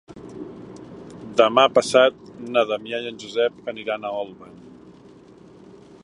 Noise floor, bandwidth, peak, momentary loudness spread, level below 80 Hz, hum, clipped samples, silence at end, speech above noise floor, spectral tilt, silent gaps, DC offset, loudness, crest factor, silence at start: -47 dBFS; 11.5 kHz; 0 dBFS; 24 LU; -64 dBFS; none; under 0.1%; 1.6 s; 26 dB; -3.5 dB/octave; none; under 0.1%; -21 LUFS; 22 dB; 0.1 s